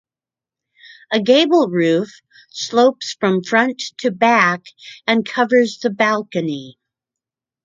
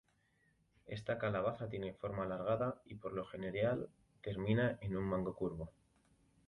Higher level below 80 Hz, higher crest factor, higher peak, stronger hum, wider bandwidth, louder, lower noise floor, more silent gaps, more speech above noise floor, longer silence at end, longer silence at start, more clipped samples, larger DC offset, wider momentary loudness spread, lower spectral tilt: second, -68 dBFS vs -62 dBFS; about the same, 18 dB vs 18 dB; first, 0 dBFS vs -22 dBFS; neither; second, 7.8 kHz vs 11 kHz; first, -17 LUFS vs -40 LUFS; first, under -90 dBFS vs -76 dBFS; neither; first, over 73 dB vs 37 dB; first, 0.95 s vs 0.75 s; first, 1.1 s vs 0.85 s; neither; neither; about the same, 13 LU vs 12 LU; second, -4.5 dB/octave vs -8.5 dB/octave